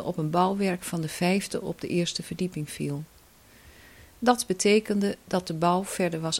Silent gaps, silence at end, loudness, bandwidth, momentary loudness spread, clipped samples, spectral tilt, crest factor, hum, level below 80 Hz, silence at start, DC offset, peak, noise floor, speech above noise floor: none; 0 s; -27 LUFS; 16.5 kHz; 10 LU; under 0.1%; -5 dB/octave; 22 dB; none; -58 dBFS; 0 s; under 0.1%; -6 dBFS; -55 dBFS; 28 dB